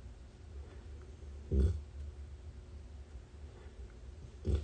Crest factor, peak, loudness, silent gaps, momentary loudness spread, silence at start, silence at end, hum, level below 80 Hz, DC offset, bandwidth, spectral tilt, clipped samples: 22 dB; -20 dBFS; -43 LUFS; none; 18 LU; 0 s; 0 s; none; -42 dBFS; under 0.1%; 9 kHz; -8.5 dB/octave; under 0.1%